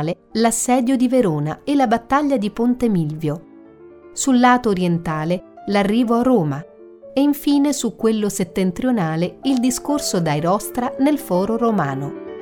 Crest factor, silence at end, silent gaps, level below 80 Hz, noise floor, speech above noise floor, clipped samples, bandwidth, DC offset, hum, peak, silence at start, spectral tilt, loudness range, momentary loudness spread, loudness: 16 dB; 0 s; none; -48 dBFS; -43 dBFS; 25 dB; under 0.1%; 19 kHz; under 0.1%; none; -4 dBFS; 0 s; -5.5 dB/octave; 2 LU; 8 LU; -19 LUFS